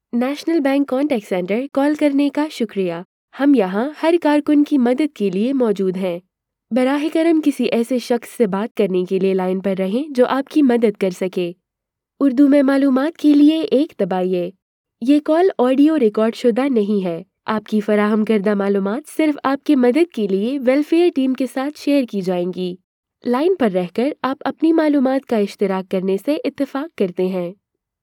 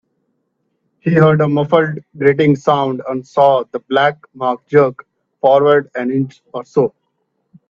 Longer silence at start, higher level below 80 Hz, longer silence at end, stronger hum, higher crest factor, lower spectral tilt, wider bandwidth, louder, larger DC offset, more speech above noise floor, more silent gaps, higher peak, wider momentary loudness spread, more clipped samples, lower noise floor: second, 0.15 s vs 1.05 s; second, -74 dBFS vs -58 dBFS; second, 0.5 s vs 0.8 s; neither; about the same, 14 dB vs 16 dB; about the same, -7 dB/octave vs -8 dB/octave; first, 15.5 kHz vs 7.2 kHz; second, -18 LUFS vs -15 LUFS; neither; first, 66 dB vs 54 dB; first, 3.05-3.28 s, 8.71-8.75 s, 14.62-14.84 s, 22.84-23.03 s vs none; second, -4 dBFS vs 0 dBFS; about the same, 8 LU vs 9 LU; neither; first, -82 dBFS vs -68 dBFS